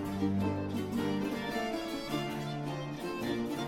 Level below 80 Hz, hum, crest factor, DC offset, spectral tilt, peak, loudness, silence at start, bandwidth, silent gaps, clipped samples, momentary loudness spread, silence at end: -58 dBFS; none; 14 dB; under 0.1%; -6 dB/octave; -20 dBFS; -35 LUFS; 0 s; 16.5 kHz; none; under 0.1%; 5 LU; 0 s